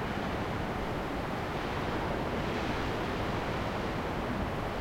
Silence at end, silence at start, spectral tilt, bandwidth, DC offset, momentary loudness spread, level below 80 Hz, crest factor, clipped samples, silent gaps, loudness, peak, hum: 0 s; 0 s; -6 dB/octave; 16.5 kHz; under 0.1%; 2 LU; -44 dBFS; 12 dB; under 0.1%; none; -34 LUFS; -20 dBFS; none